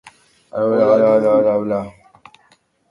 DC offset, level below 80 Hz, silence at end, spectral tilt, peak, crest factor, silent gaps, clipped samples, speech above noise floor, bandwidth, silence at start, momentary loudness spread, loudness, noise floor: under 0.1%; -58 dBFS; 1 s; -8.5 dB/octave; -2 dBFS; 16 dB; none; under 0.1%; 42 dB; 6.6 kHz; 0.05 s; 14 LU; -15 LUFS; -57 dBFS